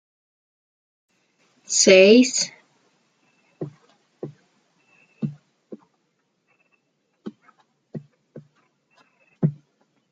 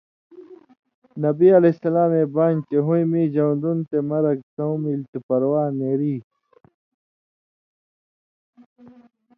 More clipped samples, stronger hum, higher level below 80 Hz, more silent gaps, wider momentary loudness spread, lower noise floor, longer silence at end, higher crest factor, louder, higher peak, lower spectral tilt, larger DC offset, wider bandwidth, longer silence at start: neither; neither; about the same, -72 dBFS vs -72 dBFS; second, none vs 0.79-0.83 s, 0.94-1.02 s, 4.43-4.57 s, 5.08-5.13 s, 5.23-5.29 s; first, 29 LU vs 10 LU; second, -71 dBFS vs under -90 dBFS; second, 0.6 s vs 3.15 s; first, 24 dB vs 18 dB; first, -17 LUFS vs -20 LUFS; about the same, -2 dBFS vs -4 dBFS; second, -3.5 dB/octave vs -12.5 dB/octave; neither; first, 9.6 kHz vs 4.7 kHz; first, 1.7 s vs 0.35 s